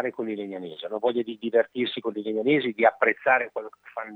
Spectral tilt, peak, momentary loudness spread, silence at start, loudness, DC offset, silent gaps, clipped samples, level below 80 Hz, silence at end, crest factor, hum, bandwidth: -7 dB/octave; -4 dBFS; 14 LU; 0 s; -25 LUFS; under 0.1%; none; under 0.1%; -84 dBFS; 0 s; 20 dB; none; 4.5 kHz